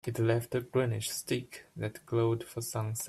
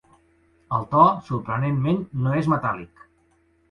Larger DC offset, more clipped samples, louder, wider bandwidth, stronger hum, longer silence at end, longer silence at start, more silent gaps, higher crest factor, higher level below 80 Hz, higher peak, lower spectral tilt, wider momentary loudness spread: neither; neither; second, -33 LUFS vs -22 LUFS; first, 14.5 kHz vs 9.2 kHz; neither; second, 0 s vs 0.85 s; second, 0.05 s vs 0.7 s; neither; about the same, 18 dB vs 22 dB; second, -66 dBFS vs -54 dBFS; second, -14 dBFS vs -2 dBFS; second, -5.5 dB/octave vs -9 dB/octave; about the same, 10 LU vs 11 LU